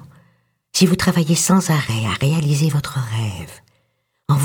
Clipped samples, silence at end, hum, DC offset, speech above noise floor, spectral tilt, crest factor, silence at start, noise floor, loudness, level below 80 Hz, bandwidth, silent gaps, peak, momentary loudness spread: under 0.1%; 0 s; none; under 0.1%; 50 dB; -5 dB/octave; 18 dB; 0 s; -67 dBFS; -18 LUFS; -48 dBFS; 19 kHz; none; -2 dBFS; 11 LU